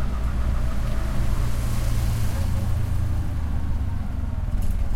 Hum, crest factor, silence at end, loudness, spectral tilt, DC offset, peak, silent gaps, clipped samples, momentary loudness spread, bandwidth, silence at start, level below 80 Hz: none; 12 dB; 0 s; -27 LUFS; -6.5 dB/octave; under 0.1%; -10 dBFS; none; under 0.1%; 3 LU; 16 kHz; 0 s; -24 dBFS